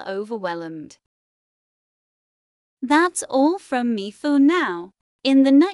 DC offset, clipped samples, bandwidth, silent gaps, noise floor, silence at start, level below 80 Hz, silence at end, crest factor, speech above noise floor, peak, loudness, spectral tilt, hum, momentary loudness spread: under 0.1%; under 0.1%; 12 kHz; 1.06-2.77 s, 5.01-5.19 s; under -90 dBFS; 0 s; -74 dBFS; 0 s; 16 dB; over 71 dB; -6 dBFS; -20 LUFS; -4 dB/octave; none; 16 LU